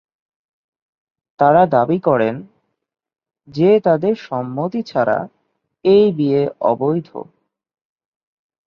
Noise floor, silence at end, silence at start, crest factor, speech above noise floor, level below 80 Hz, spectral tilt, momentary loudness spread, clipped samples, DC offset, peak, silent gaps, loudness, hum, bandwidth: -52 dBFS; 1.45 s; 1.4 s; 16 dB; 37 dB; -60 dBFS; -9 dB/octave; 11 LU; under 0.1%; under 0.1%; -2 dBFS; none; -16 LUFS; none; 6.4 kHz